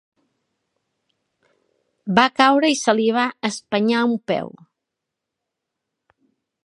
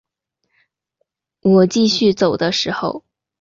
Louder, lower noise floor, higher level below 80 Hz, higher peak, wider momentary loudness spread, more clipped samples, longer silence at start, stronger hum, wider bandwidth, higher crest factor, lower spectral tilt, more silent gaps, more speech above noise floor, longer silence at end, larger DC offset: second, -19 LUFS vs -16 LUFS; first, -82 dBFS vs -74 dBFS; second, -70 dBFS vs -56 dBFS; first, 0 dBFS vs -4 dBFS; about the same, 11 LU vs 11 LU; neither; first, 2.05 s vs 1.45 s; neither; first, 11.5 kHz vs 7.6 kHz; first, 22 dB vs 16 dB; about the same, -4 dB/octave vs -5 dB/octave; neither; first, 64 dB vs 58 dB; first, 2.15 s vs 0.4 s; neither